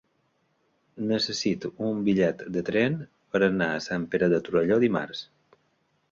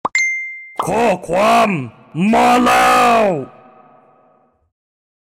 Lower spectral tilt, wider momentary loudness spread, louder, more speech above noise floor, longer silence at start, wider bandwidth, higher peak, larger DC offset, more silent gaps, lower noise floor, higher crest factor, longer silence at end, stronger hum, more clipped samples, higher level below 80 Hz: about the same, -5.5 dB/octave vs -4.5 dB/octave; second, 8 LU vs 13 LU; second, -26 LUFS vs -14 LUFS; about the same, 45 dB vs 42 dB; first, 0.95 s vs 0.05 s; second, 7.6 kHz vs 16.5 kHz; second, -8 dBFS vs -4 dBFS; neither; neither; first, -71 dBFS vs -55 dBFS; first, 18 dB vs 12 dB; second, 0.9 s vs 1.9 s; neither; neither; second, -62 dBFS vs -50 dBFS